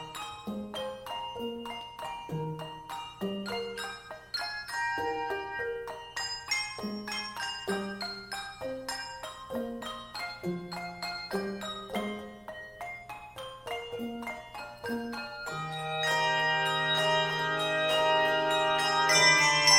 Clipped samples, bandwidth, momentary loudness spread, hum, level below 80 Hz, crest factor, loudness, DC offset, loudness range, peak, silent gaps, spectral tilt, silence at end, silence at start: under 0.1%; 16.5 kHz; 15 LU; 60 Hz at -60 dBFS; -62 dBFS; 24 dB; -31 LUFS; under 0.1%; 11 LU; -8 dBFS; none; -2 dB/octave; 0 s; 0 s